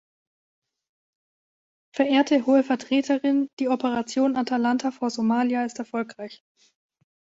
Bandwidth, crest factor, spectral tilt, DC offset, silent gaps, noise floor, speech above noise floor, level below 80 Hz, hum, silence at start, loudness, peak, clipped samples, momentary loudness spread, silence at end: 7.8 kHz; 20 dB; -4.5 dB/octave; under 0.1%; 3.53-3.57 s; under -90 dBFS; over 67 dB; -72 dBFS; none; 1.95 s; -23 LUFS; -6 dBFS; under 0.1%; 11 LU; 1.05 s